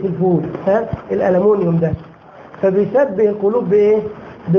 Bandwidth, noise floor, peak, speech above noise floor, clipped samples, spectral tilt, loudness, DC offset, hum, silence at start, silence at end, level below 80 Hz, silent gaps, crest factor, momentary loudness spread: 6.2 kHz; -39 dBFS; -4 dBFS; 24 dB; under 0.1%; -10.5 dB/octave; -16 LUFS; under 0.1%; none; 0 s; 0 s; -44 dBFS; none; 12 dB; 8 LU